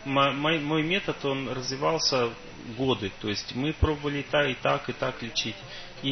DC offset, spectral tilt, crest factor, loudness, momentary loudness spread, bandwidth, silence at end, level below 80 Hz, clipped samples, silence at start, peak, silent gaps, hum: under 0.1%; -4.5 dB/octave; 18 dB; -27 LUFS; 8 LU; 6.4 kHz; 0 s; -44 dBFS; under 0.1%; 0 s; -10 dBFS; none; none